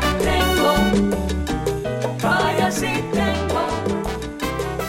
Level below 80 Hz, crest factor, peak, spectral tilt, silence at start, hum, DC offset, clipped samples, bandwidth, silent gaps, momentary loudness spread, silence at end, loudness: -30 dBFS; 14 dB; -6 dBFS; -5 dB/octave; 0 s; none; under 0.1%; under 0.1%; 17 kHz; none; 8 LU; 0 s; -21 LUFS